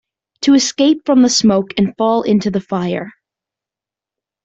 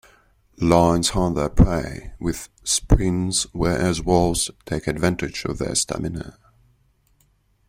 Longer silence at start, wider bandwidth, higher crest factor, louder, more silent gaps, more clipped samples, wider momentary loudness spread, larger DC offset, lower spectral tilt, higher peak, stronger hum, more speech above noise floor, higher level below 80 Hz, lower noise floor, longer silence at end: second, 0.4 s vs 0.6 s; second, 8.2 kHz vs 16 kHz; second, 14 dB vs 20 dB; first, -14 LUFS vs -21 LUFS; neither; neither; about the same, 9 LU vs 10 LU; neither; about the same, -4.5 dB/octave vs -4.5 dB/octave; about the same, -2 dBFS vs -2 dBFS; neither; first, 74 dB vs 42 dB; second, -54 dBFS vs -30 dBFS; first, -88 dBFS vs -62 dBFS; about the same, 1.35 s vs 1.4 s